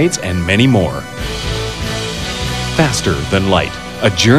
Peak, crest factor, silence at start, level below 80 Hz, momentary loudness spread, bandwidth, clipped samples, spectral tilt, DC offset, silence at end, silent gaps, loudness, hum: 0 dBFS; 14 dB; 0 s; -30 dBFS; 8 LU; 14 kHz; under 0.1%; -4.5 dB/octave; 0.8%; 0 s; none; -16 LUFS; none